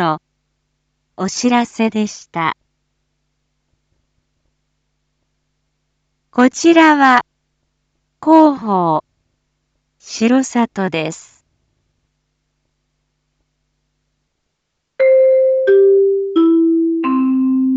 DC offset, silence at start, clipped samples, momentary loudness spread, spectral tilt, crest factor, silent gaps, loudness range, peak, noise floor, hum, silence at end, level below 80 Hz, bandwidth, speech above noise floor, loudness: under 0.1%; 0 s; under 0.1%; 12 LU; -5 dB/octave; 16 dB; none; 12 LU; 0 dBFS; -73 dBFS; none; 0 s; -64 dBFS; 8.2 kHz; 59 dB; -14 LUFS